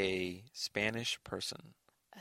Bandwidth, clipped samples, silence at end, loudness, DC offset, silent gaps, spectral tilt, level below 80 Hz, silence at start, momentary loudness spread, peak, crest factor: 16 kHz; under 0.1%; 0 s; -38 LUFS; under 0.1%; none; -3 dB/octave; -68 dBFS; 0 s; 7 LU; -18 dBFS; 22 dB